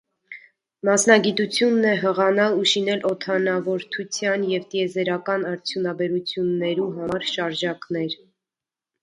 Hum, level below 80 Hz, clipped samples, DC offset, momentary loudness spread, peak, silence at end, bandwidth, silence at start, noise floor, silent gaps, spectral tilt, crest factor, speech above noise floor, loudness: none; -68 dBFS; under 0.1%; under 0.1%; 9 LU; -2 dBFS; 0.9 s; 11 kHz; 0.3 s; -90 dBFS; none; -3.5 dB/octave; 20 dB; 68 dB; -22 LUFS